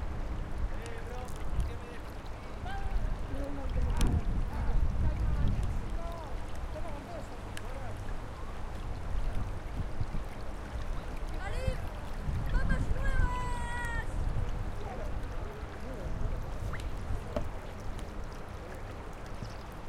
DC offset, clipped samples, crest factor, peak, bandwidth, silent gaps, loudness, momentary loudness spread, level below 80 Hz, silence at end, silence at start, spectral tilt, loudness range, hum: under 0.1%; under 0.1%; 18 dB; -16 dBFS; 12.5 kHz; none; -38 LUFS; 10 LU; -36 dBFS; 0 s; 0 s; -6.5 dB/octave; 6 LU; none